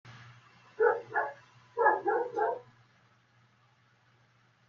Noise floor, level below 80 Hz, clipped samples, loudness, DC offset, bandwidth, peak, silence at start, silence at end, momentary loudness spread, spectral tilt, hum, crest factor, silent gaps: -67 dBFS; -84 dBFS; under 0.1%; -31 LUFS; under 0.1%; 6.8 kHz; -12 dBFS; 0.05 s; 2.05 s; 15 LU; -6.5 dB/octave; none; 22 dB; none